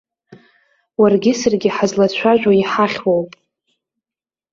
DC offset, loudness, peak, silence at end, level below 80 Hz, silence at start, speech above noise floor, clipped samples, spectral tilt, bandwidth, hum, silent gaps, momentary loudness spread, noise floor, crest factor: under 0.1%; -15 LUFS; -2 dBFS; 1.25 s; -58 dBFS; 0.3 s; over 75 dB; under 0.1%; -5.5 dB/octave; 7.6 kHz; none; none; 6 LU; under -90 dBFS; 16 dB